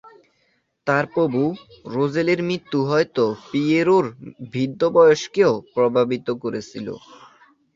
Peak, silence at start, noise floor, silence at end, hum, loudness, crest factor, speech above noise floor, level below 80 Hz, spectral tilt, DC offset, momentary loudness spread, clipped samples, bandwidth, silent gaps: -4 dBFS; 0.05 s; -67 dBFS; 0.6 s; none; -20 LUFS; 18 dB; 47 dB; -62 dBFS; -6.5 dB/octave; under 0.1%; 15 LU; under 0.1%; 7.6 kHz; none